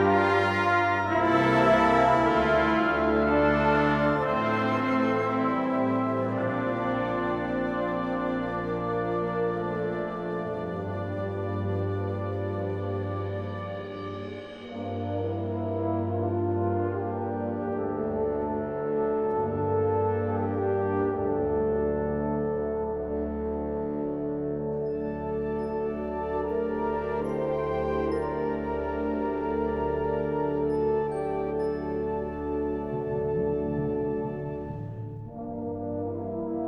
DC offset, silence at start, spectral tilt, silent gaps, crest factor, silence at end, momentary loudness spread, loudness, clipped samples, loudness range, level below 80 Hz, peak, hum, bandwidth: under 0.1%; 0 s; -8 dB/octave; none; 16 dB; 0 s; 10 LU; -28 LUFS; under 0.1%; 8 LU; -48 dBFS; -10 dBFS; none; 8.8 kHz